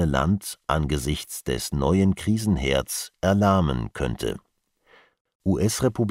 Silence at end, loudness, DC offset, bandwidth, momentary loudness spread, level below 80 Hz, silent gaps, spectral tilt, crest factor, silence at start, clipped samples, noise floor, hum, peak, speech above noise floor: 0 s; -24 LUFS; under 0.1%; 16 kHz; 9 LU; -38 dBFS; 5.21-5.25 s, 5.35-5.40 s; -5.5 dB/octave; 18 dB; 0 s; under 0.1%; -61 dBFS; none; -6 dBFS; 38 dB